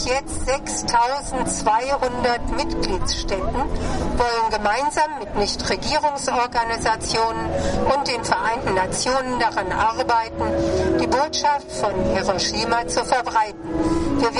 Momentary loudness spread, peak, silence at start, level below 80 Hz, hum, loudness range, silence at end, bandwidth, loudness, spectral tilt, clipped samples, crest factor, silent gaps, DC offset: 4 LU; -4 dBFS; 0 s; -34 dBFS; none; 2 LU; 0 s; 11.5 kHz; -21 LUFS; -3.5 dB/octave; under 0.1%; 16 dB; none; under 0.1%